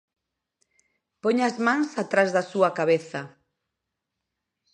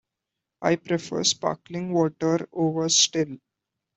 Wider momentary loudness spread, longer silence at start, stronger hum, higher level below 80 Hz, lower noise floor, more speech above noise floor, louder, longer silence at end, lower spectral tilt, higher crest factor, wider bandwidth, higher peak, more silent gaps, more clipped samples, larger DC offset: about the same, 12 LU vs 10 LU; first, 1.25 s vs 0.6 s; neither; second, -80 dBFS vs -66 dBFS; about the same, -83 dBFS vs -85 dBFS; about the same, 60 dB vs 61 dB; about the same, -24 LUFS vs -24 LUFS; first, 1.45 s vs 0.6 s; first, -5.5 dB/octave vs -3.5 dB/octave; about the same, 22 dB vs 20 dB; first, 10 kHz vs 8.4 kHz; about the same, -6 dBFS vs -6 dBFS; neither; neither; neither